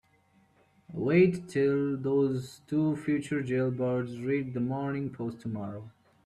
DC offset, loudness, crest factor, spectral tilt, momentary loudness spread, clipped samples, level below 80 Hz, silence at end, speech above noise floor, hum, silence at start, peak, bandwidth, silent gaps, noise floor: under 0.1%; -30 LUFS; 18 dB; -8 dB/octave; 12 LU; under 0.1%; -66 dBFS; 0.35 s; 37 dB; none; 0.9 s; -12 dBFS; 12.5 kHz; none; -66 dBFS